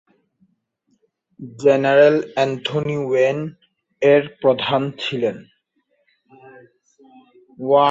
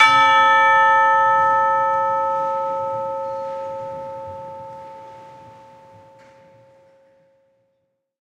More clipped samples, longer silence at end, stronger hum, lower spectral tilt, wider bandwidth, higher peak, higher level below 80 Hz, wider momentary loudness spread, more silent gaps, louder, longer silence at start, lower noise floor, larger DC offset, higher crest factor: neither; second, 0 s vs 2.8 s; neither; first, -6 dB/octave vs -2.5 dB/octave; second, 7.8 kHz vs 10 kHz; about the same, -2 dBFS vs 0 dBFS; about the same, -64 dBFS vs -68 dBFS; second, 16 LU vs 22 LU; neither; about the same, -18 LUFS vs -17 LUFS; first, 1.4 s vs 0 s; second, -67 dBFS vs -71 dBFS; neither; about the same, 18 dB vs 20 dB